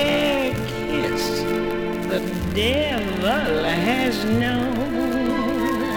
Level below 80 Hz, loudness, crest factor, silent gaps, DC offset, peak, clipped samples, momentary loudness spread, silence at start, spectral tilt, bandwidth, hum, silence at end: -40 dBFS; -22 LUFS; 16 dB; none; under 0.1%; -6 dBFS; under 0.1%; 4 LU; 0 s; -5 dB/octave; 19.5 kHz; none; 0 s